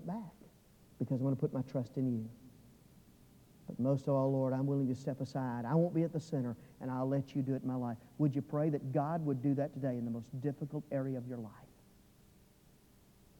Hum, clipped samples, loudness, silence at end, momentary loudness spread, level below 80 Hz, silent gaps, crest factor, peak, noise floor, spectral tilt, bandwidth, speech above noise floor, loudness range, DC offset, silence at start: none; under 0.1%; -36 LUFS; 1.75 s; 11 LU; -72 dBFS; none; 16 dB; -20 dBFS; -64 dBFS; -9.5 dB/octave; 18 kHz; 29 dB; 5 LU; under 0.1%; 0 s